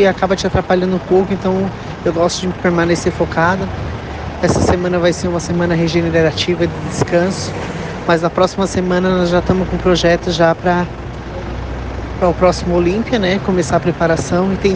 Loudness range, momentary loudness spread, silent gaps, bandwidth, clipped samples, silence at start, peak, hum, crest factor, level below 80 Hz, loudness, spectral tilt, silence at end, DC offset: 2 LU; 10 LU; none; 9.6 kHz; under 0.1%; 0 s; 0 dBFS; none; 14 dB; -32 dBFS; -16 LUFS; -6 dB/octave; 0 s; under 0.1%